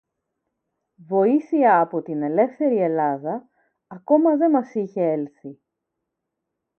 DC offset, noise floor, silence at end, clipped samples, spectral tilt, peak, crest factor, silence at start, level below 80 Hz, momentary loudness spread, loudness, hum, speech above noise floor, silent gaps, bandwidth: under 0.1%; -81 dBFS; 1.25 s; under 0.1%; -10 dB/octave; -4 dBFS; 18 dB; 1.1 s; -78 dBFS; 15 LU; -21 LUFS; none; 61 dB; none; 6 kHz